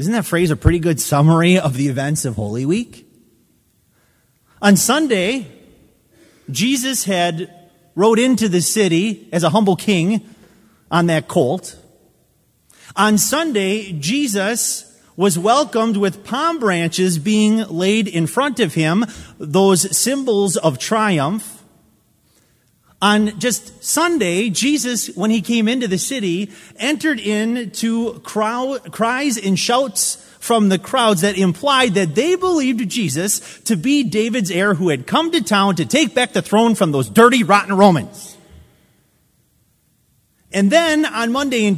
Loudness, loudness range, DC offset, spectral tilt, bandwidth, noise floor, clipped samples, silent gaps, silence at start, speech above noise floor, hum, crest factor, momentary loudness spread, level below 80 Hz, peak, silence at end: -16 LUFS; 4 LU; under 0.1%; -4.5 dB/octave; 16 kHz; -60 dBFS; under 0.1%; none; 0 s; 44 dB; none; 18 dB; 8 LU; -42 dBFS; 0 dBFS; 0 s